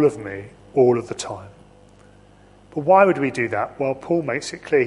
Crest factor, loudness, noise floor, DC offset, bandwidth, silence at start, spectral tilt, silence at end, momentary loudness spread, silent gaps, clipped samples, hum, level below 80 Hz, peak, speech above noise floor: 20 dB; -20 LUFS; -50 dBFS; under 0.1%; 11.5 kHz; 0 s; -6 dB/octave; 0 s; 18 LU; none; under 0.1%; 50 Hz at -50 dBFS; -56 dBFS; -2 dBFS; 30 dB